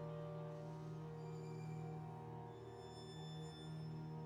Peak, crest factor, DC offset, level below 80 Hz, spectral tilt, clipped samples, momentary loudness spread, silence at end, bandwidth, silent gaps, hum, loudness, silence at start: -38 dBFS; 12 dB; under 0.1%; -76 dBFS; -7.5 dB/octave; under 0.1%; 4 LU; 0 s; 11 kHz; none; none; -51 LUFS; 0 s